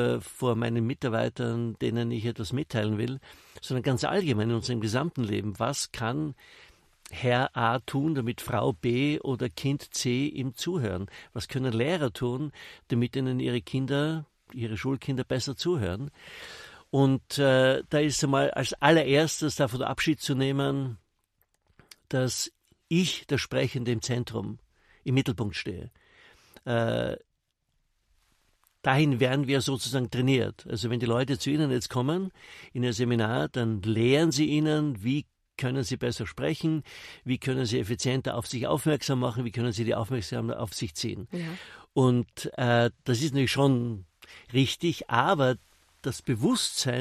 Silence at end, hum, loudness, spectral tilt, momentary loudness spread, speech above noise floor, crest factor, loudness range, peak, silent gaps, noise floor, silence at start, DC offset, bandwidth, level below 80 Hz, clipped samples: 0 s; none; -28 LUFS; -5.5 dB/octave; 12 LU; 49 dB; 24 dB; 5 LU; -4 dBFS; none; -76 dBFS; 0 s; under 0.1%; 13.5 kHz; -58 dBFS; under 0.1%